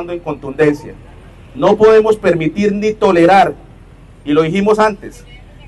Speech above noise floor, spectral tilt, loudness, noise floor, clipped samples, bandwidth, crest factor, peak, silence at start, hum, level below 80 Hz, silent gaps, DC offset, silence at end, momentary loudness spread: 26 dB; -6.5 dB/octave; -12 LUFS; -39 dBFS; under 0.1%; 11.5 kHz; 12 dB; -2 dBFS; 0 s; none; -40 dBFS; none; under 0.1%; 0.3 s; 16 LU